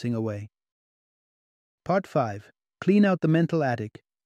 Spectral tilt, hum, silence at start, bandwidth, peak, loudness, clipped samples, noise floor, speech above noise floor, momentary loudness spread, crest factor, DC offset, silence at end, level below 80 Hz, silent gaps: -8.5 dB/octave; none; 0 s; 8.6 kHz; -10 dBFS; -25 LUFS; under 0.1%; under -90 dBFS; over 66 dB; 17 LU; 18 dB; under 0.1%; 0.35 s; -68 dBFS; 0.72-1.78 s